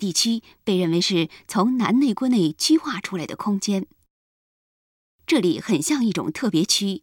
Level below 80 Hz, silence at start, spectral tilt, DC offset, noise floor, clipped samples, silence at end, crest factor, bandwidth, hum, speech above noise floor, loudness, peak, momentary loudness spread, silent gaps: -64 dBFS; 0 s; -4 dB/octave; under 0.1%; under -90 dBFS; under 0.1%; 0.05 s; 16 dB; 17 kHz; none; over 69 dB; -22 LUFS; -6 dBFS; 8 LU; 4.10-5.19 s